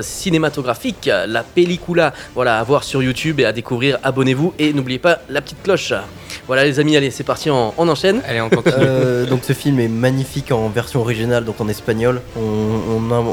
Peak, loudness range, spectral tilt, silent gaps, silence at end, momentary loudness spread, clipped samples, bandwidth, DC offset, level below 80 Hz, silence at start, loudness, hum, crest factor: 0 dBFS; 2 LU; -5.5 dB/octave; none; 0 s; 6 LU; under 0.1%; 19.5 kHz; under 0.1%; -42 dBFS; 0 s; -17 LUFS; none; 16 dB